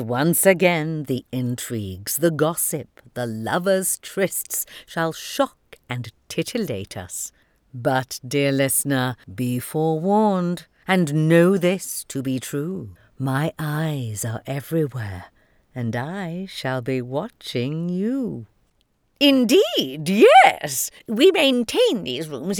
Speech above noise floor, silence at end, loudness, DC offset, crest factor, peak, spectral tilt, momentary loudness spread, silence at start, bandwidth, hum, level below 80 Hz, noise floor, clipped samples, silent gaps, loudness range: 45 dB; 0 s; -21 LUFS; under 0.1%; 22 dB; 0 dBFS; -4.5 dB/octave; 14 LU; 0 s; over 20 kHz; none; -62 dBFS; -66 dBFS; under 0.1%; none; 10 LU